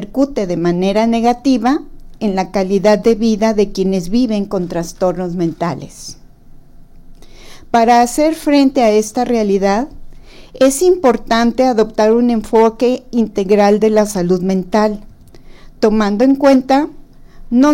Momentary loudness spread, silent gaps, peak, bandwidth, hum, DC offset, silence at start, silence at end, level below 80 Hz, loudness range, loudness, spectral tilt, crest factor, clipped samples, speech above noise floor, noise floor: 8 LU; none; -2 dBFS; 16.5 kHz; none; under 0.1%; 0 s; 0 s; -36 dBFS; 5 LU; -14 LUFS; -5.5 dB/octave; 12 dB; under 0.1%; 25 dB; -38 dBFS